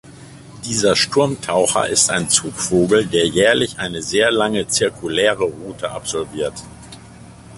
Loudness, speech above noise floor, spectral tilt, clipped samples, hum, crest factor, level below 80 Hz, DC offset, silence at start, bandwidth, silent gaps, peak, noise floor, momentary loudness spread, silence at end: -17 LUFS; 22 dB; -3 dB/octave; under 0.1%; none; 18 dB; -48 dBFS; under 0.1%; 0.05 s; 11.5 kHz; none; 0 dBFS; -40 dBFS; 11 LU; 0 s